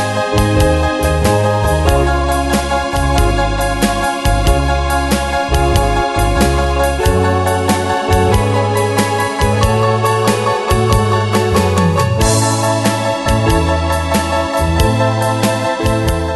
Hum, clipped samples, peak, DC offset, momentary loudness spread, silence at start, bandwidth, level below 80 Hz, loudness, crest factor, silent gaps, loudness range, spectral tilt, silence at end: none; under 0.1%; 0 dBFS; under 0.1%; 3 LU; 0 s; 12.5 kHz; -20 dBFS; -14 LUFS; 14 dB; none; 1 LU; -5 dB/octave; 0 s